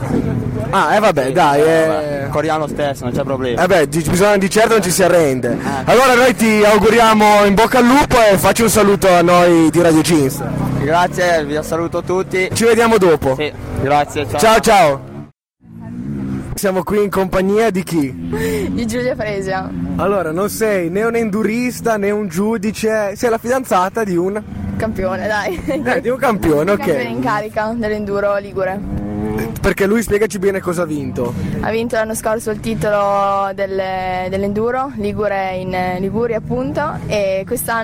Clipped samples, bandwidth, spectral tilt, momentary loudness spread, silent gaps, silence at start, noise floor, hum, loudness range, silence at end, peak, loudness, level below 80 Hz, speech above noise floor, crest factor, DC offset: under 0.1%; 16.5 kHz; -5 dB/octave; 10 LU; none; 0 s; -43 dBFS; none; 8 LU; 0 s; -2 dBFS; -15 LUFS; -36 dBFS; 28 dB; 12 dB; under 0.1%